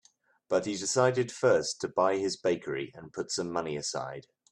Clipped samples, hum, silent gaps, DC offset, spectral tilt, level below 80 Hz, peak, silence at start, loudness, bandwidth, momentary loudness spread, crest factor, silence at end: under 0.1%; none; none; under 0.1%; -4 dB/octave; -70 dBFS; -10 dBFS; 0.5 s; -30 LUFS; 12 kHz; 11 LU; 20 dB; 0.3 s